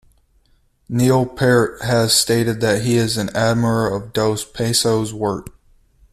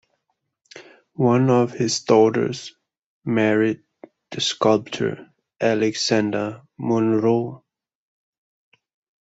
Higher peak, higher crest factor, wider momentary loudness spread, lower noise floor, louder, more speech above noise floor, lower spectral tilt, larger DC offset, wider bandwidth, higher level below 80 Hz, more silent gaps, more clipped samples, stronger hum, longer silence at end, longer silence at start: about the same, -2 dBFS vs -4 dBFS; about the same, 16 dB vs 20 dB; second, 8 LU vs 16 LU; second, -58 dBFS vs -75 dBFS; first, -17 LUFS vs -20 LUFS; second, 41 dB vs 55 dB; about the same, -4.5 dB/octave vs -5 dB/octave; neither; first, 14.5 kHz vs 8.2 kHz; first, -46 dBFS vs -64 dBFS; second, none vs 3.03-3.21 s; neither; neither; second, 0.65 s vs 1.65 s; first, 0.9 s vs 0.75 s